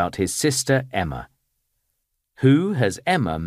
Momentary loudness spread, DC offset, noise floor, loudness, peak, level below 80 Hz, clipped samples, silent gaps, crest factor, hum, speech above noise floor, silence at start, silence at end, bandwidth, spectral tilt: 9 LU; under 0.1%; -75 dBFS; -21 LUFS; -4 dBFS; -48 dBFS; under 0.1%; none; 18 dB; none; 54 dB; 0 s; 0 s; 15.5 kHz; -5 dB/octave